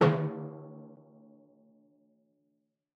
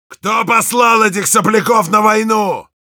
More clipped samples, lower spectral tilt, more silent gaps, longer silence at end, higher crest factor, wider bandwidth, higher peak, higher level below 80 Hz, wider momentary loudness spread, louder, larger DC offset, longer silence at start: neither; first, -8.5 dB/octave vs -3.5 dB/octave; neither; first, 2.1 s vs 0.2 s; first, 24 dB vs 12 dB; second, 6.6 kHz vs over 20 kHz; second, -10 dBFS vs 0 dBFS; second, -80 dBFS vs -64 dBFS; first, 27 LU vs 6 LU; second, -33 LUFS vs -12 LUFS; neither; about the same, 0 s vs 0.1 s